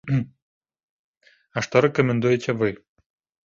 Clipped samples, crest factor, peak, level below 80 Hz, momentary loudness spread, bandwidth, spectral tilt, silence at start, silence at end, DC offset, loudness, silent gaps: under 0.1%; 22 dB; -2 dBFS; -58 dBFS; 14 LU; 7.6 kHz; -6.5 dB/octave; 0.05 s; 0.7 s; under 0.1%; -22 LUFS; 0.42-0.61 s, 0.83-1.21 s